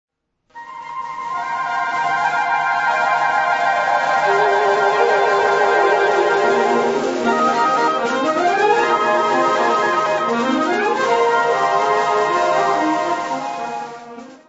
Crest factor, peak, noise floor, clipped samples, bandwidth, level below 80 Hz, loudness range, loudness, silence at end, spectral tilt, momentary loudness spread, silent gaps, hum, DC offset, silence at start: 16 dB; -2 dBFS; -47 dBFS; under 0.1%; 8 kHz; -62 dBFS; 3 LU; -17 LUFS; 0.15 s; -3.5 dB/octave; 10 LU; none; none; under 0.1%; 0.55 s